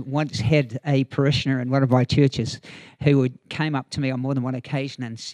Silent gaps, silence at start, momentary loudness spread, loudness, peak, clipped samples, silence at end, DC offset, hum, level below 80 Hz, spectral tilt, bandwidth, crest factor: none; 0 s; 9 LU; -23 LUFS; -4 dBFS; under 0.1%; 0 s; under 0.1%; none; -50 dBFS; -7 dB/octave; 9.8 kHz; 18 dB